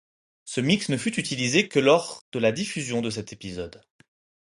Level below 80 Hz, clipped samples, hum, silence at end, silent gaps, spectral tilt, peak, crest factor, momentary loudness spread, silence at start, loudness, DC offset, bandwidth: -60 dBFS; under 0.1%; none; 0.8 s; 2.21-2.32 s; -4.5 dB/octave; -6 dBFS; 20 dB; 15 LU; 0.45 s; -24 LUFS; under 0.1%; 11.5 kHz